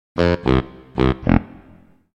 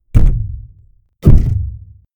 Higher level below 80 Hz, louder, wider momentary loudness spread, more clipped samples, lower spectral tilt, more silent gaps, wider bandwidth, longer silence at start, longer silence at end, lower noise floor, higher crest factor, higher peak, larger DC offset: second, -30 dBFS vs -14 dBFS; second, -20 LUFS vs -15 LUFS; second, 4 LU vs 19 LU; second, under 0.1% vs 2%; second, -8.5 dB/octave vs -10 dB/octave; neither; first, 8 kHz vs 3.1 kHz; about the same, 0.15 s vs 0.15 s; first, 0.7 s vs 0.4 s; about the same, -49 dBFS vs -48 dBFS; first, 20 dB vs 12 dB; about the same, 0 dBFS vs 0 dBFS; neither